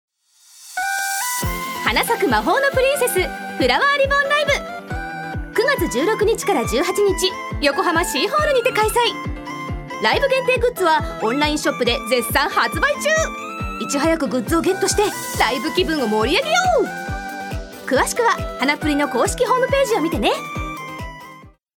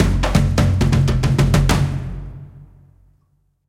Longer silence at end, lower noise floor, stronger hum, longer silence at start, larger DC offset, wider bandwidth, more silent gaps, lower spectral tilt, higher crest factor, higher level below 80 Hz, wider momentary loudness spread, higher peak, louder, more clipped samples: second, 0.25 s vs 1.05 s; second, -51 dBFS vs -62 dBFS; neither; first, 0.55 s vs 0 s; neither; first, over 20 kHz vs 16 kHz; neither; second, -3.5 dB/octave vs -6.5 dB/octave; about the same, 18 dB vs 16 dB; second, -36 dBFS vs -24 dBFS; second, 12 LU vs 17 LU; about the same, -2 dBFS vs 0 dBFS; about the same, -19 LUFS vs -17 LUFS; neither